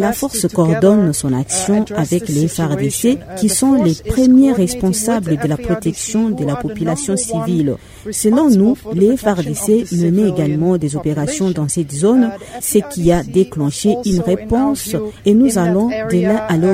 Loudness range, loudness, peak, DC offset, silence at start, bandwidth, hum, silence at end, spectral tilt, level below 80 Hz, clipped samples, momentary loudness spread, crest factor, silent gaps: 2 LU; -15 LUFS; 0 dBFS; under 0.1%; 0 s; 16 kHz; none; 0 s; -6 dB/octave; -38 dBFS; under 0.1%; 7 LU; 14 dB; none